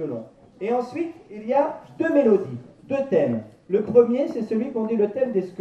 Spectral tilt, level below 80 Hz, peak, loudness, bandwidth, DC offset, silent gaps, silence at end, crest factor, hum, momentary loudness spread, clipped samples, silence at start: -8.5 dB/octave; -66 dBFS; -4 dBFS; -23 LUFS; 8.2 kHz; under 0.1%; none; 0 s; 18 dB; none; 14 LU; under 0.1%; 0 s